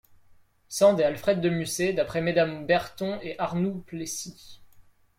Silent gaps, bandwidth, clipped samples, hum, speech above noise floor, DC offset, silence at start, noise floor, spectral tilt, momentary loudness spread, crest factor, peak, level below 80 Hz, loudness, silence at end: none; 16 kHz; under 0.1%; none; 32 dB; under 0.1%; 0.7 s; -57 dBFS; -5 dB/octave; 12 LU; 18 dB; -8 dBFS; -60 dBFS; -26 LUFS; 0.4 s